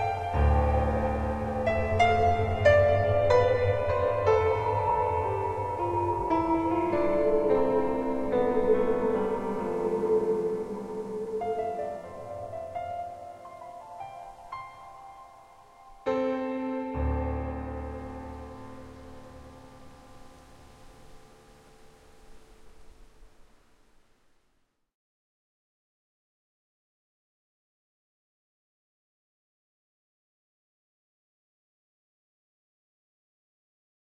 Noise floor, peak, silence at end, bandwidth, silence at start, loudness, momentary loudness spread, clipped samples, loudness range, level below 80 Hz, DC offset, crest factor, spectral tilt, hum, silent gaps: -72 dBFS; -8 dBFS; 10.75 s; 11.5 kHz; 0 s; -27 LUFS; 21 LU; under 0.1%; 16 LU; -42 dBFS; under 0.1%; 20 dB; -7.5 dB/octave; none; none